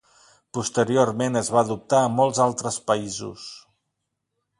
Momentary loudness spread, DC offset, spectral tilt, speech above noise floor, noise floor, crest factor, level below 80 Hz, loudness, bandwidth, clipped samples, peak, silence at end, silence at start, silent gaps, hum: 13 LU; under 0.1%; -4.5 dB/octave; 57 dB; -79 dBFS; 20 dB; -62 dBFS; -22 LUFS; 11.5 kHz; under 0.1%; -4 dBFS; 1 s; 0.55 s; none; none